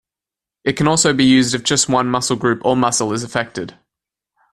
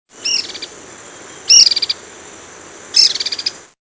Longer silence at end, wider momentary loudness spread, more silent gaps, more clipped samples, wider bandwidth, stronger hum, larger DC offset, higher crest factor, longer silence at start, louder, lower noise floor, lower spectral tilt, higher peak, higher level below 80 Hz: first, 0.8 s vs 0.25 s; second, 11 LU vs 23 LU; neither; neither; first, 13 kHz vs 8 kHz; neither; neither; about the same, 16 dB vs 18 dB; first, 0.65 s vs 0.2 s; second, -16 LUFS vs -11 LUFS; first, -88 dBFS vs -36 dBFS; first, -3.5 dB/octave vs 2.5 dB/octave; about the same, 0 dBFS vs 0 dBFS; first, -50 dBFS vs -60 dBFS